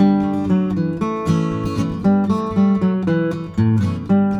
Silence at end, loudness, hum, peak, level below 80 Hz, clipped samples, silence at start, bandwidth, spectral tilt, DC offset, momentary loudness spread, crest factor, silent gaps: 0 s; -18 LUFS; none; -2 dBFS; -44 dBFS; under 0.1%; 0 s; 8 kHz; -8.5 dB/octave; under 0.1%; 5 LU; 14 dB; none